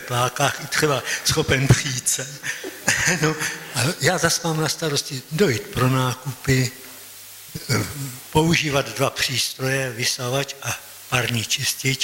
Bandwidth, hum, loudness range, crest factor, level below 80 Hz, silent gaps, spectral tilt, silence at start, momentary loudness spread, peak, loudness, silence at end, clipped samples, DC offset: 16.5 kHz; none; 3 LU; 18 dB; -46 dBFS; none; -3.5 dB/octave; 0 s; 10 LU; -4 dBFS; -21 LUFS; 0 s; under 0.1%; under 0.1%